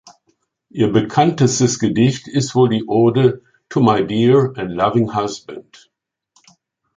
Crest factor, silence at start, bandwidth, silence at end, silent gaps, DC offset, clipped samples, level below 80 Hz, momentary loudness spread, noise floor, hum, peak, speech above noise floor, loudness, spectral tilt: 16 dB; 0.75 s; 9.4 kHz; 1.35 s; none; under 0.1%; under 0.1%; -52 dBFS; 11 LU; -65 dBFS; none; -2 dBFS; 50 dB; -16 LUFS; -6 dB/octave